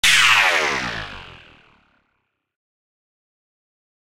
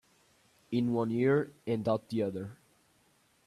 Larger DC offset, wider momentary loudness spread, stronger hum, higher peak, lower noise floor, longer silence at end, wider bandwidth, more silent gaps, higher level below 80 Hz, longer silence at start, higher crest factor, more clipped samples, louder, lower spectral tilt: neither; first, 22 LU vs 8 LU; neither; first, -2 dBFS vs -16 dBFS; first, -73 dBFS vs -69 dBFS; first, 2.65 s vs 0.9 s; first, 16 kHz vs 12.5 kHz; neither; first, -50 dBFS vs -70 dBFS; second, 0.05 s vs 0.7 s; about the same, 20 dB vs 16 dB; neither; first, -15 LUFS vs -32 LUFS; second, 0 dB/octave vs -8 dB/octave